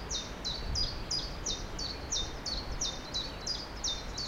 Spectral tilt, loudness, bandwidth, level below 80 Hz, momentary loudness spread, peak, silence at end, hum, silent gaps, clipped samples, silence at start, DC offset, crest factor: -2 dB/octave; -35 LUFS; 16.5 kHz; -42 dBFS; 3 LU; -20 dBFS; 0 s; none; none; under 0.1%; 0 s; under 0.1%; 16 dB